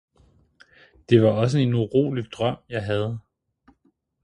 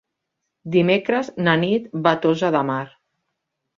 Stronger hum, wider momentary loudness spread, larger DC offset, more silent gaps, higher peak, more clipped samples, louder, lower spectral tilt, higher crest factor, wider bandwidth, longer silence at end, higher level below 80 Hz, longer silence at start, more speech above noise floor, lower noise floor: neither; about the same, 11 LU vs 9 LU; neither; neither; about the same, -4 dBFS vs -2 dBFS; neither; about the same, -22 LUFS vs -20 LUFS; about the same, -7.5 dB/octave vs -7 dB/octave; about the same, 20 dB vs 20 dB; first, 10 kHz vs 7.4 kHz; first, 1.05 s vs 0.9 s; first, -56 dBFS vs -64 dBFS; first, 1.1 s vs 0.65 s; second, 46 dB vs 59 dB; second, -67 dBFS vs -79 dBFS